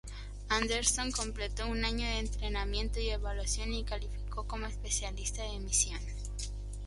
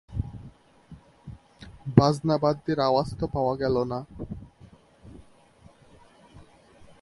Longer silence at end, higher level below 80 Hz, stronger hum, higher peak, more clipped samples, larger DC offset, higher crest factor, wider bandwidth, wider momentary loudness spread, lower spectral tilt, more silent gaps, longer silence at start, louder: second, 0 s vs 0.15 s; first, -38 dBFS vs -48 dBFS; first, 50 Hz at -35 dBFS vs none; second, -12 dBFS vs 0 dBFS; neither; neither; second, 22 dB vs 28 dB; about the same, 11.5 kHz vs 11.5 kHz; second, 11 LU vs 26 LU; second, -2.5 dB/octave vs -7.5 dB/octave; neither; about the same, 0.05 s vs 0.1 s; second, -34 LUFS vs -25 LUFS